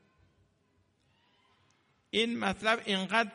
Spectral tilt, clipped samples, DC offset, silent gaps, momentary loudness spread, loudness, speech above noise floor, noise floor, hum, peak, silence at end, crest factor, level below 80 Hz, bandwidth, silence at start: -4 dB/octave; under 0.1%; under 0.1%; none; 2 LU; -30 LUFS; 42 dB; -72 dBFS; none; -12 dBFS; 0 s; 22 dB; -68 dBFS; 10.5 kHz; 2.15 s